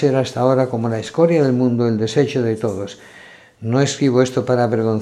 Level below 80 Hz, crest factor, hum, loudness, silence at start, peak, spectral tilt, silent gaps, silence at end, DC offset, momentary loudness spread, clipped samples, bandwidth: -60 dBFS; 16 dB; none; -17 LUFS; 0 s; -2 dBFS; -6.5 dB/octave; none; 0 s; under 0.1%; 8 LU; under 0.1%; 11.5 kHz